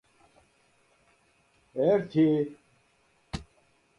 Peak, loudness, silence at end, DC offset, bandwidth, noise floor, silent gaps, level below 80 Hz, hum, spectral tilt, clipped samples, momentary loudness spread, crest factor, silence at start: -12 dBFS; -27 LUFS; 0.55 s; under 0.1%; 10.5 kHz; -67 dBFS; none; -58 dBFS; none; -8 dB/octave; under 0.1%; 17 LU; 18 dB; 1.75 s